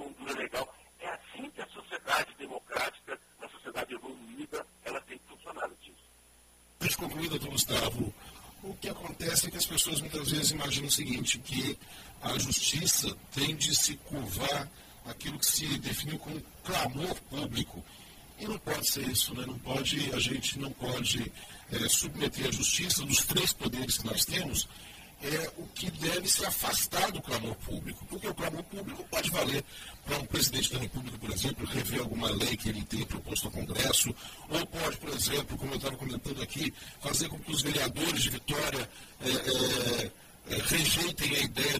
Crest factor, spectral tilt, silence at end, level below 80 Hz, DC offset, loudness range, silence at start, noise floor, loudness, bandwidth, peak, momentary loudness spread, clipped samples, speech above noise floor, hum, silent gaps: 22 dB; -2.5 dB/octave; 0 s; -52 dBFS; under 0.1%; 8 LU; 0 s; -60 dBFS; -31 LUFS; 15.5 kHz; -12 dBFS; 15 LU; under 0.1%; 28 dB; none; none